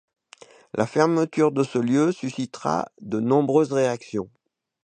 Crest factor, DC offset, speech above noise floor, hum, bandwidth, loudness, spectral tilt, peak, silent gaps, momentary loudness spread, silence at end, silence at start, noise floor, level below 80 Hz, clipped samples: 20 dB; under 0.1%; 28 dB; none; 9.6 kHz; -23 LUFS; -6.5 dB/octave; -2 dBFS; none; 10 LU; 0.6 s; 0.75 s; -50 dBFS; -66 dBFS; under 0.1%